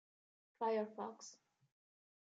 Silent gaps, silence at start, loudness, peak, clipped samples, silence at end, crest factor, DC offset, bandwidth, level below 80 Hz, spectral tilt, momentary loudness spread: none; 0.6 s; -43 LUFS; -28 dBFS; under 0.1%; 1 s; 20 dB; under 0.1%; 8 kHz; under -90 dBFS; -4.5 dB/octave; 17 LU